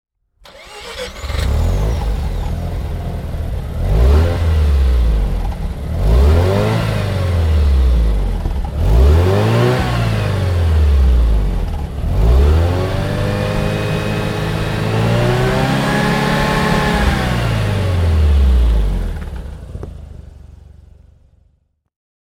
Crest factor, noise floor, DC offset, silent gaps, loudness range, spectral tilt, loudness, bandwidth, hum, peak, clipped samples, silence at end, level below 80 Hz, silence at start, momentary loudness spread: 14 dB; -59 dBFS; under 0.1%; none; 6 LU; -6.5 dB/octave; -16 LUFS; 15.5 kHz; none; -2 dBFS; under 0.1%; 1.8 s; -18 dBFS; 0.55 s; 11 LU